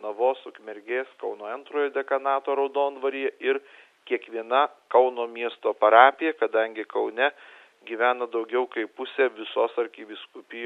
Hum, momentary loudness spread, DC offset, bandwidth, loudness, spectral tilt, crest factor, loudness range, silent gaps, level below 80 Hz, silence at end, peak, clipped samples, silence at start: none; 13 LU; under 0.1%; 4.5 kHz; -25 LUFS; -4 dB/octave; 24 dB; 6 LU; none; -86 dBFS; 0 s; 0 dBFS; under 0.1%; 0 s